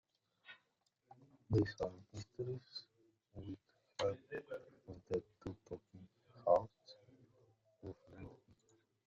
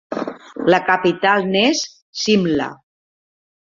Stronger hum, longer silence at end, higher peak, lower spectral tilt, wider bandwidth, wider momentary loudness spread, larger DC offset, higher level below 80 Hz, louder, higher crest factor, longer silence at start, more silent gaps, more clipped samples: neither; second, 0.7 s vs 1.05 s; second, -20 dBFS vs -2 dBFS; first, -6 dB/octave vs -4 dB/octave; about the same, 7.4 kHz vs 7.6 kHz; first, 24 LU vs 12 LU; neither; second, -68 dBFS vs -58 dBFS; second, -43 LUFS vs -17 LUFS; first, 26 dB vs 18 dB; first, 0.5 s vs 0.1 s; second, none vs 2.02-2.13 s; neither